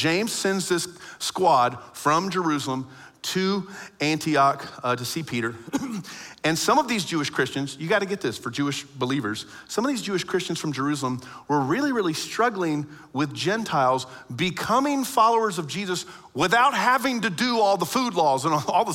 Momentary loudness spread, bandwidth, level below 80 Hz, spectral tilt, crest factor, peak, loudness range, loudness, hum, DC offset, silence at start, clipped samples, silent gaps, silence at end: 10 LU; 16.5 kHz; -64 dBFS; -4 dB/octave; 18 dB; -6 dBFS; 4 LU; -24 LUFS; none; under 0.1%; 0 s; under 0.1%; none; 0 s